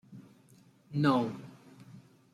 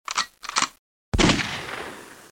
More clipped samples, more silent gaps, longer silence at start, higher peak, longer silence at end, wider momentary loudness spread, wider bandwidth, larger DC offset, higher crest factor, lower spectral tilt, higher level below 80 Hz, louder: neither; second, none vs 0.79-1.12 s; about the same, 0.1 s vs 0.1 s; second, -16 dBFS vs -4 dBFS; first, 0.35 s vs 0.05 s; first, 26 LU vs 15 LU; second, 13 kHz vs 17 kHz; neither; about the same, 20 dB vs 22 dB; first, -7.5 dB/octave vs -3 dB/octave; second, -74 dBFS vs -36 dBFS; second, -31 LUFS vs -24 LUFS